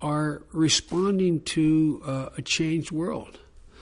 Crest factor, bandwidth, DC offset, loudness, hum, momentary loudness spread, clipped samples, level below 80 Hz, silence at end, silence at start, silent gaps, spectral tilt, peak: 18 dB; 10.5 kHz; under 0.1%; -25 LUFS; none; 10 LU; under 0.1%; -52 dBFS; 0 s; 0 s; none; -4.5 dB/octave; -8 dBFS